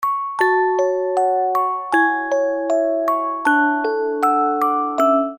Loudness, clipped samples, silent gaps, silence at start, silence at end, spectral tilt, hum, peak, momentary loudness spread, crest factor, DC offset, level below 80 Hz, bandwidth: -18 LUFS; under 0.1%; none; 0 s; 0 s; -3.5 dB/octave; none; -4 dBFS; 3 LU; 14 dB; under 0.1%; -66 dBFS; 18 kHz